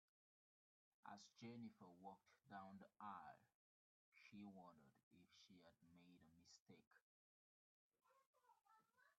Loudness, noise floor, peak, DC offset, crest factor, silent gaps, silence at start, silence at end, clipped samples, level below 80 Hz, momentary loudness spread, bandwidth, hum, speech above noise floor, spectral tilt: -63 LUFS; under -90 dBFS; -42 dBFS; under 0.1%; 24 dB; 3.55-4.12 s, 5.03-5.11 s, 6.60-6.66 s, 6.87-6.91 s, 7.02-7.90 s, 8.27-8.33 s; 1.05 s; 0.05 s; under 0.1%; under -90 dBFS; 9 LU; 7.2 kHz; none; over 28 dB; -4.5 dB/octave